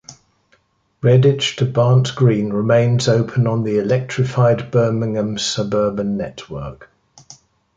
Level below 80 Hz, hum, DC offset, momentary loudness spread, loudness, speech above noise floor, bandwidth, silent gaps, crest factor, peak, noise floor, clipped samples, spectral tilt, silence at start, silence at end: -50 dBFS; none; under 0.1%; 9 LU; -17 LUFS; 44 dB; 7.8 kHz; none; 14 dB; -2 dBFS; -60 dBFS; under 0.1%; -6.5 dB/octave; 0.1 s; 0.45 s